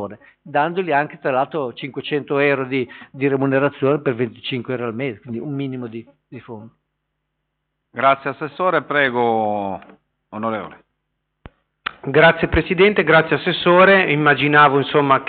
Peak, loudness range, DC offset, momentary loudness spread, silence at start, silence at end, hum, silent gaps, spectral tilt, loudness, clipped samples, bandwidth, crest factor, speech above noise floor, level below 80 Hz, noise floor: -2 dBFS; 11 LU; under 0.1%; 18 LU; 0 s; 0 s; none; none; -3.5 dB/octave; -17 LUFS; under 0.1%; 4.7 kHz; 16 dB; 57 dB; -44 dBFS; -75 dBFS